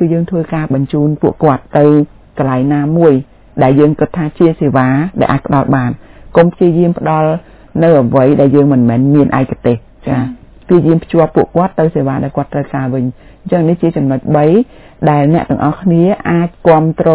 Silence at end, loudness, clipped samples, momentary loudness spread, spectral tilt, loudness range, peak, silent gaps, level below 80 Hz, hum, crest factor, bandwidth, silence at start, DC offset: 0 s; -11 LUFS; 1%; 8 LU; -12.5 dB/octave; 3 LU; 0 dBFS; none; -40 dBFS; none; 10 dB; 4 kHz; 0 s; under 0.1%